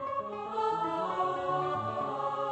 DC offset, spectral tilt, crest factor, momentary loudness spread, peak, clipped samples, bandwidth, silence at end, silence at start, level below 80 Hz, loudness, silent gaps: under 0.1%; -6.5 dB/octave; 14 dB; 4 LU; -20 dBFS; under 0.1%; 8.4 kHz; 0 s; 0 s; -70 dBFS; -32 LUFS; none